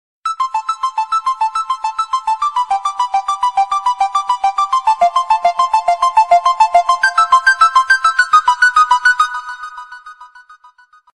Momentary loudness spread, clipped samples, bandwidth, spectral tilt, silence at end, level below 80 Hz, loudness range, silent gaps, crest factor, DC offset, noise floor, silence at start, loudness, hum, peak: 9 LU; under 0.1%; 13 kHz; 1.5 dB/octave; 0.9 s; -54 dBFS; 6 LU; none; 14 dB; under 0.1%; -47 dBFS; 0.25 s; -13 LUFS; none; 0 dBFS